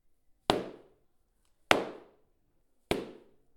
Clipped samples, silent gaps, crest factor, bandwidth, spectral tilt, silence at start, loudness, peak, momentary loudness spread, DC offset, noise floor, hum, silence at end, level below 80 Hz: under 0.1%; none; 36 dB; 19 kHz; -3.5 dB/octave; 0.5 s; -32 LUFS; 0 dBFS; 19 LU; under 0.1%; -70 dBFS; none; 0.45 s; -58 dBFS